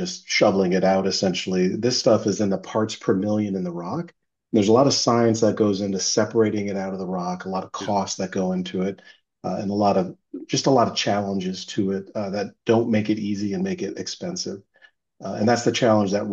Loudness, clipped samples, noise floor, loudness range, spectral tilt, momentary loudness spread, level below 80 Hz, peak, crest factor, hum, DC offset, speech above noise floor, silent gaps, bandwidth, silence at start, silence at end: -22 LUFS; under 0.1%; -57 dBFS; 5 LU; -5 dB/octave; 11 LU; -66 dBFS; -4 dBFS; 18 dB; none; under 0.1%; 35 dB; none; 8.2 kHz; 0 s; 0 s